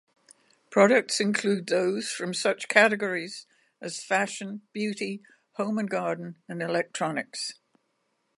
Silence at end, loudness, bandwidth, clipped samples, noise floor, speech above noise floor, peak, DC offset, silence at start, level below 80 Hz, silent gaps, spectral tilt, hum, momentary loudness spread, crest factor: 0.85 s; -27 LUFS; 11.5 kHz; under 0.1%; -75 dBFS; 48 dB; -4 dBFS; under 0.1%; 0.7 s; -82 dBFS; none; -4 dB/octave; none; 17 LU; 24 dB